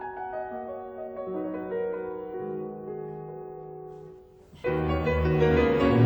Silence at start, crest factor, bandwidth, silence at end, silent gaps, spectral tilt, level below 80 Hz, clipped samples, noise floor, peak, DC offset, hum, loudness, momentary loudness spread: 0 s; 18 dB; over 20 kHz; 0 s; none; -9 dB/octave; -42 dBFS; under 0.1%; -51 dBFS; -10 dBFS; under 0.1%; none; -29 LUFS; 19 LU